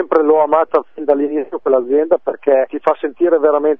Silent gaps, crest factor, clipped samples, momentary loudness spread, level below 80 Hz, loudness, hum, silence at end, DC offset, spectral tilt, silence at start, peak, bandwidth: none; 14 dB; under 0.1%; 5 LU; -66 dBFS; -15 LUFS; none; 0.05 s; 0.8%; -8 dB/octave; 0 s; 0 dBFS; 3.8 kHz